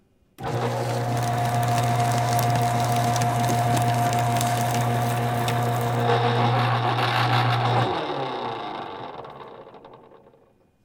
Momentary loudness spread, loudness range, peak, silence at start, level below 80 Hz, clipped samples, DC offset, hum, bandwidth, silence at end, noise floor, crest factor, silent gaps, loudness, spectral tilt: 12 LU; 4 LU; -6 dBFS; 0.4 s; -54 dBFS; under 0.1%; under 0.1%; none; 18.5 kHz; 0.9 s; -59 dBFS; 18 dB; none; -23 LUFS; -5.5 dB/octave